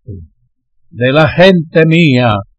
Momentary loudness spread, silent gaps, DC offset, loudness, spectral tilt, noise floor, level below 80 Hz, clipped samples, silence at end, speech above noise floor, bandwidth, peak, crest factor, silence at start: 5 LU; none; under 0.1%; -9 LUFS; -7.5 dB/octave; -57 dBFS; -40 dBFS; 0.1%; 0.15 s; 48 dB; 8 kHz; 0 dBFS; 10 dB; 0.1 s